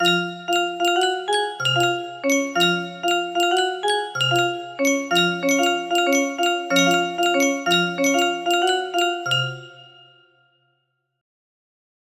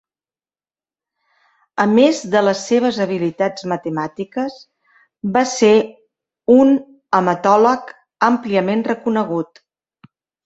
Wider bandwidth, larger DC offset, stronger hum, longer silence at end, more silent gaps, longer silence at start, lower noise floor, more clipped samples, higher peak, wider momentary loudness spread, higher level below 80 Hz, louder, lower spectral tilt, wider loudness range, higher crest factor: first, 15.5 kHz vs 8.2 kHz; neither; neither; first, 2.35 s vs 1 s; neither; second, 0 s vs 1.75 s; second, -72 dBFS vs under -90 dBFS; neither; about the same, -4 dBFS vs -2 dBFS; second, 4 LU vs 12 LU; second, -68 dBFS vs -62 dBFS; second, -20 LUFS vs -17 LUFS; second, -3 dB/octave vs -5.5 dB/octave; about the same, 5 LU vs 4 LU; about the same, 18 dB vs 16 dB